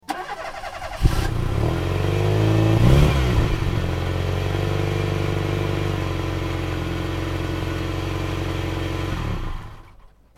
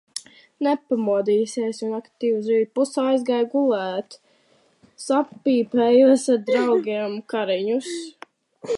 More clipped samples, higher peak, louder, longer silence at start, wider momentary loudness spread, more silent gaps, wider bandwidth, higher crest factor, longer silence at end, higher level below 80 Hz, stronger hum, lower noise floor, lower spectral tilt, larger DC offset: neither; first, -2 dBFS vs -6 dBFS; about the same, -23 LUFS vs -21 LUFS; about the same, 0.1 s vs 0.15 s; about the same, 12 LU vs 14 LU; neither; first, 15.5 kHz vs 11.5 kHz; about the same, 18 dB vs 16 dB; first, 0.3 s vs 0 s; first, -28 dBFS vs -76 dBFS; neither; second, -48 dBFS vs -61 dBFS; first, -6.5 dB/octave vs -4.5 dB/octave; neither